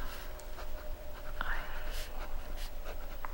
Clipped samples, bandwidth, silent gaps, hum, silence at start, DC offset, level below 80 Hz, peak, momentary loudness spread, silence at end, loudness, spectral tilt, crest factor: under 0.1%; 16.5 kHz; none; none; 0 s; under 0.1%; -38 dBFS; -18 dBFS; 7 LU; 0 s; -44 LUFS; -3.5 dB/octave; 18 dB